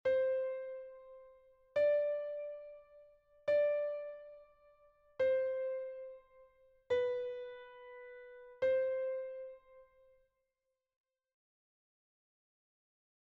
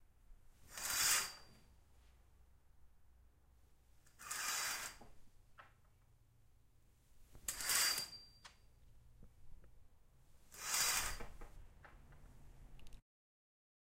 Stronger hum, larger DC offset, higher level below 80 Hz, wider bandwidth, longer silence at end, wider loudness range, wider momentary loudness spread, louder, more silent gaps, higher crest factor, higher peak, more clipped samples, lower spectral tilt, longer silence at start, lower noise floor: neither; neither; second, -78 dBFS vs -62 dBFS; second, 6 kHz vs 16 kHz; first, 3.5 s vs 1 s; about the same, 4 LU vs 5 LU; about the same, 22 LU vs 24 LU; about the same, -37 LUFS vs -38 LUFS; neither; second, 16 dB vs 28 dB; second, -24 dBFS vs -20 dBFS; neither; first, -1.5 dB/octave vs 1 dB/octave; about the same, 0.05 s vs 0 s; first, -89 dBFS vs -69 dBFS